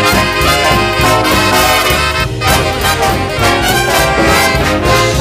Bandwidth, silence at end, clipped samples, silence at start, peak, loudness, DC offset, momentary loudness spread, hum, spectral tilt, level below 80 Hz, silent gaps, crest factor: 16 kHz; 0 s; under 0.1%; 0 s; 0 dBFS; -10 LUFS; under 0.1%; 3 LU; none; -3.5 dB/octave; -24 dBFS; none; 10 dB